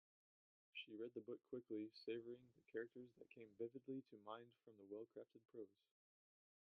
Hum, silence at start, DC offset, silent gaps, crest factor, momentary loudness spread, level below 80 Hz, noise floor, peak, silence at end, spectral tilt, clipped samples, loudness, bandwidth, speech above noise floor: none; 0.75 s; under 0.1%; none; 20 dB; 11 LU; under -90 dBFS; under -90 dBFS; -36 dBFS; 0.95 s; -4 dB/octave; under 0.1%; -56 LUFS; 5.2 kHz; over 34 dB